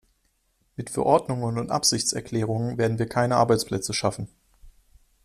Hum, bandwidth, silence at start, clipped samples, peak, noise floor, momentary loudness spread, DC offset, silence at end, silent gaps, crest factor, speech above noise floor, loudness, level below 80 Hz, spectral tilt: none; 14.5 kHz; 0.8 s; under 0.1%; -6 dBFS; -69 dBFS; 12 LU; under 0.1%; 0.55 s; none; 20 dB; 45 dB; -24 LUFS; -54 dBFS; -4.5 dB/octave